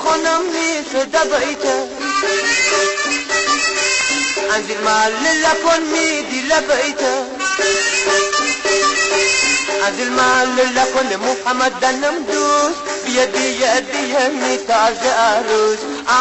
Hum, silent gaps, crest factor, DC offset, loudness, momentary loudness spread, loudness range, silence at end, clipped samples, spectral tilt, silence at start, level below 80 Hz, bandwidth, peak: none; none; 14 dB; under 0.1%; -15 LUFS; 5 LU; 2 LU; 0 s; under 0.1%; -0.5 dB/octave; 0 s; -50 dBFS; 8.4 kHz; -4 dBFS